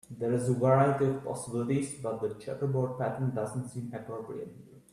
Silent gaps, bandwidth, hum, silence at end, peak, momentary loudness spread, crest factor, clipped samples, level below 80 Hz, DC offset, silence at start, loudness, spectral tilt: none; 12.5 kHz; none; 0.15 s; -12 dBFS; 15 LU; 18 dB; under 0.1%; -66 dBFS; under 0.1%; 0.1 s; -31 LUFS; -7.5 dB/octave